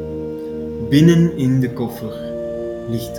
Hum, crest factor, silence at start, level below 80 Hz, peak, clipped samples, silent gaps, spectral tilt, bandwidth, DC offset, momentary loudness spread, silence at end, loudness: none; 18 dB; 0 s; -44 dBFS; 0 dBFS; under 0.1%; none; -7.5 dB/octave; 17 kHz; under 0.1%; 14 LU; 0 s; -19 LUFS